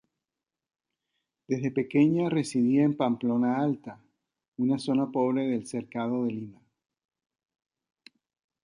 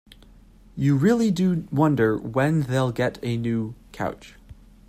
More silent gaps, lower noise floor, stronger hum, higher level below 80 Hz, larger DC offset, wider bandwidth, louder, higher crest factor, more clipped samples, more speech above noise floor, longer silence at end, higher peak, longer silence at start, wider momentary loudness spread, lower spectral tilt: first, 4.48-4.52 s vs none; first, -90 dBFS vs -50 dBFS; neither; second, -74 dBFS vs -50 dBFS; neither; second, 11 kHz vs 15 kHz; second, -27 LUFS vs -23 LUFS; about the same, 18 dB vs 16 dB; neither; first, 63 dB vs 28 dB; first, 2.1 s vs 0.35 s; second, -12 dBFS vs -8 dBFS; first, 1.5 s vs 0.75 s; about the same, 11 LU vs 11 LU; about the same, -7 dB/octave vs -7.5 dB/octave